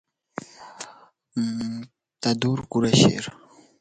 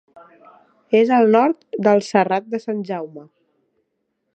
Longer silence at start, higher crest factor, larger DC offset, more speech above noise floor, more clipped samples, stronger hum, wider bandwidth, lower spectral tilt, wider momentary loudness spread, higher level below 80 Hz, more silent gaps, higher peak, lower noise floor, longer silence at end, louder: second, 0.6 s vs 0.9 s; about the same, 22 dB vs 18 dB; neither; second, 29 dB vs 55 dB; neither; neither; first, 9.4 kHz vs 8.4 kHz; second, -5 dB/octave vs -6.5 dB/octave; first, 22 LU vs 13 LU; first, -56 dBFS vs -74 dBFS; neither; about the same, -2 dBFS vs -2 dBFS; second, -51 dBFS vs -73 dBFS; second, 0.5 s vs 1.1 s; second, -23 LUFS vs -18 LUFS